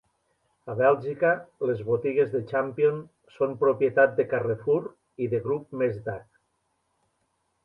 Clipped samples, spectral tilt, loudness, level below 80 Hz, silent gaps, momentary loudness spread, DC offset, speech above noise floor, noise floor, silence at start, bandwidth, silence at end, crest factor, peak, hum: under 0.1%; -9.5 dB/octave; -26 LUFS; -66 dBFS; none; 12 LU; under 0.1%; 49 dB; -74 dBFS; 0.65 s; 5 kHz; 1.45 s; 20 dB; -6 dBFS; none